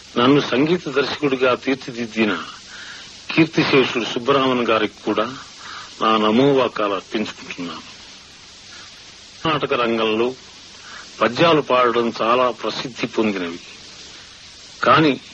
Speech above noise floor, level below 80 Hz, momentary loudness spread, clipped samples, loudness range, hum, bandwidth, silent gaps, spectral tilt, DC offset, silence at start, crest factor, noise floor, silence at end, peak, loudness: 24 dB; -58 dBFS; 22 LU; under 0.1%; 5 LU; none; 8.8 kHz; none; -5 dB/octave; under 0.1%; 0.05 s; 18 dB; -42 dBFS; 0 s; -2 dBFS; -19 LUFS